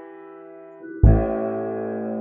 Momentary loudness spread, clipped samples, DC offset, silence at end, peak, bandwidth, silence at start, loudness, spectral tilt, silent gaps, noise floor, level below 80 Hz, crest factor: 24 LU; under 0.1%; under 0.1%; 0 s; -2 dBFS; 2.8 kHz; 0 s; -22 LUFS; -13.5 dB/octave; none; -42 dBFS; -26 dBFS; 20 dB